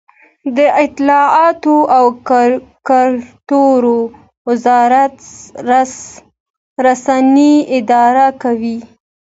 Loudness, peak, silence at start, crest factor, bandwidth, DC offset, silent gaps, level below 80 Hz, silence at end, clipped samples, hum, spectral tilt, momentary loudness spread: -11 LUFS; 0 dBFS; 0.45 s; 12 dB; 8 kHz; under 0.1%; 4.37-4.45 s, 6.40-6.76 s; -56 dBFS; 0.55 s; under 0.1%; none; -4.5 dB/octave; 14 LU